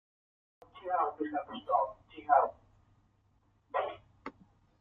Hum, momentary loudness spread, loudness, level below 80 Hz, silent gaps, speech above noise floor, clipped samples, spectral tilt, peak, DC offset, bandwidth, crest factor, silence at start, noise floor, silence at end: none; 20 LU; -33 LUFS; -72 dBFS; none; 40 dB; under 0.1%; -7 dB/octave; -12 dBFS; under 0.1%; 4.8 kHz; 22 dB; 0.75 s; -71 dBFS; 0.5 s